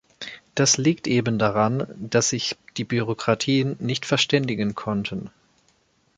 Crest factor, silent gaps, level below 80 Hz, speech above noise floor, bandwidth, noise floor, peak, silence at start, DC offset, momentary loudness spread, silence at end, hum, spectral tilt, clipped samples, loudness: 20 dB; none; -58 dBFS; 41 dB; 9.6 kHz; -64 dBFS; -4 dBFS; 0.2 s; under 0.1%; 11 LU; 0.9 s; none; -4 dB/octave; under 0.1%; -23 LUFS